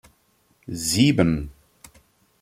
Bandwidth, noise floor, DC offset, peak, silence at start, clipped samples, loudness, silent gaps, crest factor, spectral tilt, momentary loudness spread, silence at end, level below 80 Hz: 16 kHz; -64 dBFS; under 0.1%; -4 dBFS; 0.7 s; under 0.1%; -21 LUFS; none; 22 dB; -5 dB/octave; 18 LU; 0.9 s; -46 dBFS